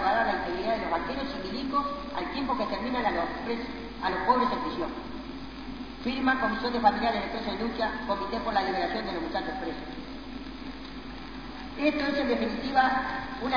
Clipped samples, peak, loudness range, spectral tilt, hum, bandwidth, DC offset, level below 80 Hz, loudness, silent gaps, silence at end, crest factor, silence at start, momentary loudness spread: under 0.1%; -8 dBFS; 5 LU; -6 dB/octave; none; 5.4 kHz; 0.4%; -48 dBFS; -29 LUFS; none; 0 s; 22 dB; 0 s; 15 LU